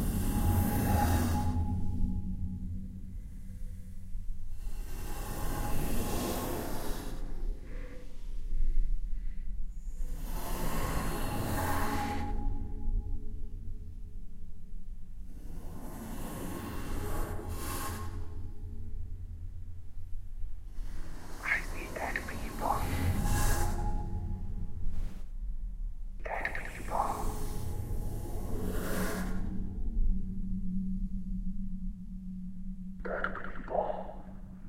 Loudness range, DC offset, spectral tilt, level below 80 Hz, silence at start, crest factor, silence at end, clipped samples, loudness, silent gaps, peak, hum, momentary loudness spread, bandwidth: 9 LU; under 0.1%; -5.5 dB/octave; -36 dBFS; 0 s; 16 dB; 0 s; under 0.1%; -37 LUFS; none; -16 dBFS; none; 15 LU; 16 kHz